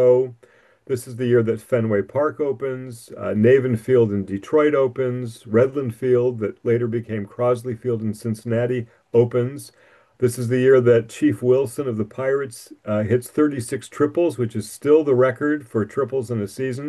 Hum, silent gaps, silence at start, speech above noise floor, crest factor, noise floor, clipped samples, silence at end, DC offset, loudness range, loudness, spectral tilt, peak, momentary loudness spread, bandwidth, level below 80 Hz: none; none; 0 s; 33 dB; 16 dB; -53 dBFS; under 0.1%; 0 s; under 0.1%; 3 LU; -21 LUFS; -7.5 dB/octave; -4 dBFS; 11 LU; 12.5 kHz; -64 dBFS